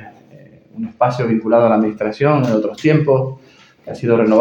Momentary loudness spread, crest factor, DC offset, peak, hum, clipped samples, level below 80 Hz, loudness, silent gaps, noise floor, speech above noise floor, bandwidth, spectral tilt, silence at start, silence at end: 13 LU; 16 dB; under 0.1%; 0 dBFS; none; under 0.1%; -58 dBFS; -16 LUFS; none; -44 dBFS; 29 dB; 8 kHz; -8.5 dB/octave; 0 s; 0 s